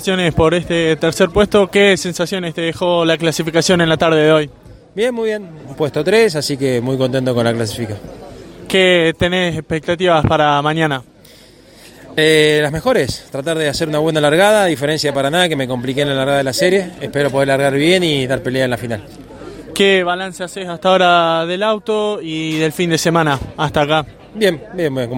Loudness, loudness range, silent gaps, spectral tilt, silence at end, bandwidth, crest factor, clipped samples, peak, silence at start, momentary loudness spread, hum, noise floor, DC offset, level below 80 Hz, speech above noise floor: -15 LUFS; 3 LU; none; -4.5 dB/octave; 0 s; 16.5 kHz; 16 dB; under 0.1%; 0 dBFS; 0 s; 11 LU; none; -43 dBFS; under 0.1%; -42 dBFS; 28 dB